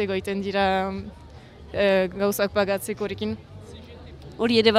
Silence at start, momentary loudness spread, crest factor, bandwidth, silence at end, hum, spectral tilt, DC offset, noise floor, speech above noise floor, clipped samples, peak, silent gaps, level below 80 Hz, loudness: 0 s; 22 LU; 20 dB; 16 kHz; 0 s; none; -5 dB/octave; under 0.1%; -44 dBFS; 21 dB; under 0.1%; -4 dBFS; none; -50 dBFS; -24 LUFS